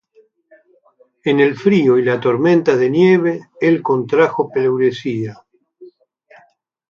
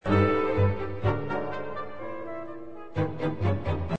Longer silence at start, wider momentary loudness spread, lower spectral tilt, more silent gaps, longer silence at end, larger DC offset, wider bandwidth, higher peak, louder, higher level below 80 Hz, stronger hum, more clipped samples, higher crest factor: first, 1.25 s vs 0 s; second, 9 LU vs 14 LU; second, -7.5 dB/octave vs -9 dB/octave; neither; first, 1.05 s vs 0 s; second, under 0.1% vs 1%; first, 7.2 kHz vs 6 kHz; first, 0 dBFS vs -10 dBFS; first, -15 LUFS vs -29 LUFS; second, -64 dBFS vs -48 dBFS; neither; neither; about the same, 16 dB vs 18 dB